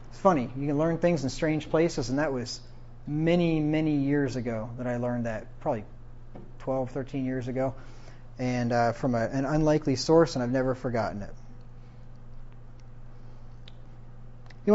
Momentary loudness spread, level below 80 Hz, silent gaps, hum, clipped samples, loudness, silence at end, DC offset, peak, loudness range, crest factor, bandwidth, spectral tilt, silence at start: 20 LU; -44 dBFS; none; none; under 0.1%; -28 LUFS; 0 s; under 0.1%; -8 dBFS; 8 LU; 20 dB; 8 kHz; -6.5 dB/octave; 0 s